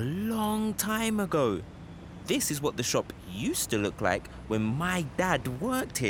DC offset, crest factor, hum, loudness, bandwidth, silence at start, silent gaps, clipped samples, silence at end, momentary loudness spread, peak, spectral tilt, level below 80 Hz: under 0.1%; 20 dB; none; -29 LUFS; 17.5 kHz; 0 s; none; under 0.1%; 0 s; 8 LU; -10 dBFS; -4.5 dB/octave; -52 dBFS